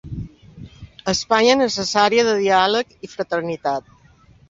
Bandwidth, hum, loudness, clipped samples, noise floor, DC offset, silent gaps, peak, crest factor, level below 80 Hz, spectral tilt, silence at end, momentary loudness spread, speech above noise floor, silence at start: 7.8 kHz; none; -18 LUFS; under 0.1%; -51 dBFS; under 0.1%; none; -2 dBFS; 18 dB; -48 dBFS; -3.5 dB/octave; 0.7 s; 15 LU; 33 dB; 0.05 s